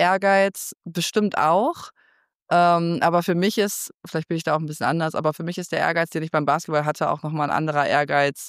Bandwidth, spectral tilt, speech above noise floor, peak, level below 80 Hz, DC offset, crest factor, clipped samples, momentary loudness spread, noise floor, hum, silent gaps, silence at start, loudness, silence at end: 15.5 kHz; -5 dB/octave; 41 dB; -8 dBFS; -70 dBFS; under 0.1%; 14 dB; under 0.1%; 8 LU; -62 dBFS; none; 2.35-2.46 s, 3.94-4.00 s; 0 s; -22 LUFS; 0 s